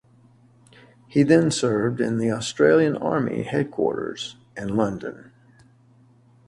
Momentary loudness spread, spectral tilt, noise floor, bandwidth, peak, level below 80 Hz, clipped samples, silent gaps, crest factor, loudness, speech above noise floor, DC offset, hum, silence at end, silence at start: 16 LU; -6 dB/octave; -55 dBFS; 11.5 kHz; -4 dBFS; -58 dBFS; under 0.1%; none; 20 dB; -22 LUFS; 34 dB; under 0.1%; none; 1.3 s; 1.1 s